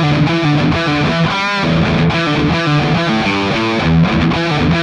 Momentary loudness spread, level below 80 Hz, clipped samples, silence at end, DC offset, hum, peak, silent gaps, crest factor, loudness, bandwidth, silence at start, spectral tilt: 2 LU; -32 dBFS; under 0.1%; 0 s; under 0.1%; none; -4 dBFS; none; 10 dB; -13 LUFS; 9.2 kHz; 0 s; -6.5 dB/octave